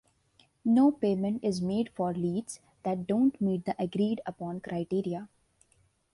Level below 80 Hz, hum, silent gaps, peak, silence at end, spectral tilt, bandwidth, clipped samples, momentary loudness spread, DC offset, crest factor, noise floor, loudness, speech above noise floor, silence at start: -66 dBFS; none; none; -14 dBFS; 0.9 s; -7.5 dB/octave; 11.5 kHz; under 0.1%; 12 LU; under 0.1%; 16 dB; -69 dBFS; -30 LUFS; 40 dB; 0.65 s